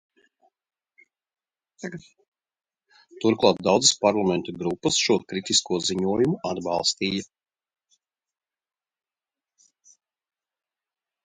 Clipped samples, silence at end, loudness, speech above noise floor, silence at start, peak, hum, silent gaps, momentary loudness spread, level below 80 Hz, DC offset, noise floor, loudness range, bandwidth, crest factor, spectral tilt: under 0.1%; 4 s; -23 LUFS; over 67 dB; 1.8 s; -2 dBFS; none; 2.28-2.32 s; 15 LU; -62 dBFS; under 0.1%; under -90 dBFS; 9 LU; 9.6 kHz; 26 dB; -3.5 dB/octave